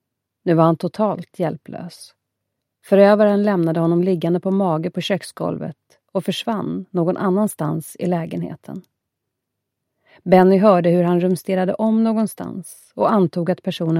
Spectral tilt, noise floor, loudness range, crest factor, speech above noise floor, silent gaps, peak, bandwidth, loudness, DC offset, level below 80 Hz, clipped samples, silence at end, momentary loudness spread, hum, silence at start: -7.5 dB/octave; -79 dBFS; 6 LU; 18 dB; 61 dB; none; 0 dBFS; 15.5 kHz; -18 LUFS; under 0.1%; -64 dBFS; under 0.1%; 0 s; 17 LU; none; 0.45 s